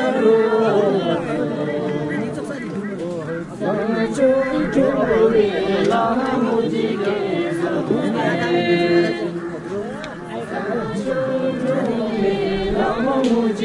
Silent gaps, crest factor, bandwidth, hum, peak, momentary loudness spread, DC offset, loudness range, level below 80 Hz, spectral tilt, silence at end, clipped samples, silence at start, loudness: none; 16 dB; 11.5 kHz; none; -4 dBFS; 11 LU; under 0.1%; 5 LU; -46 dBFS; -6.5 dB/octave; 0 s; under 0.1%; 0 s; -20 LUFS